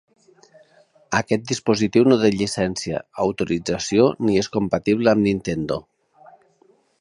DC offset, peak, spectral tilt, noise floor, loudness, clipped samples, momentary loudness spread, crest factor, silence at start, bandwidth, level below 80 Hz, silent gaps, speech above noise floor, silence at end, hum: under 0.1%; -2 dBFS; -5.5 dB/octave; -59 dBFS; -20 LUFS; under 0.1%; 8 LU; 20 dB; 1.1 s; 11.5 kHz; -50 dBFS; none; 39 dB; 1.2 s; none